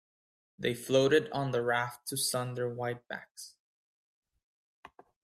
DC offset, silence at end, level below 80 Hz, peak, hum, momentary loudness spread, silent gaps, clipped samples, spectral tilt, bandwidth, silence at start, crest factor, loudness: under 0.1%; 0.35 s; -74 dBFS; -12 dBFS; none; 17 LU; 3.31-3.35 s, 3.59-4.22 s, 4.43-4.83 s; under 0.1%; -4 dB/octave; 15.5 kHz; 0.6 s; 22 dB; -31 LUFS